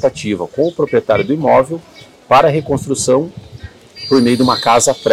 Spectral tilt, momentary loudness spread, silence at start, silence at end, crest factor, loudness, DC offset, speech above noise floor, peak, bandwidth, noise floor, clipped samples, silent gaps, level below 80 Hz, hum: -4.5 dB/octave; 11 LU; 0 s; 0 s; 12 dB; -13 LUFS; under 0.1%; 22 dB; -2 dBFS; 16 kHz; -35 dBFS; under 0.1%; none; -46 dBFS; none